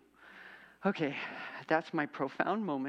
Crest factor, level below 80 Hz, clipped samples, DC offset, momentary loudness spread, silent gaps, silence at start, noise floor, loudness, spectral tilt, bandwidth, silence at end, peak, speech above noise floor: 22 dB; -80 dBFS; under 0.1%; under 0.1%; 20 LU; none; 0.2 s; -55 dBFS; -35 LUFS; -7 dB/octave; 9 kHz; 0 s; -14 dBFS; 21 dB